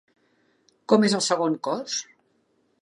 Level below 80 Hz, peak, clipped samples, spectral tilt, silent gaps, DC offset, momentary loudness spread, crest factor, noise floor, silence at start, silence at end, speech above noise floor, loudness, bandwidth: -78 dBFS; -4 dBFS; under 0.1%; -4 dB/octave; none; under 0.1%; 11 LU; 22 dB; -68 dBFS; 0.9 s; 0.8 s; 45 dB; -23 LUFS; 11.5 kHz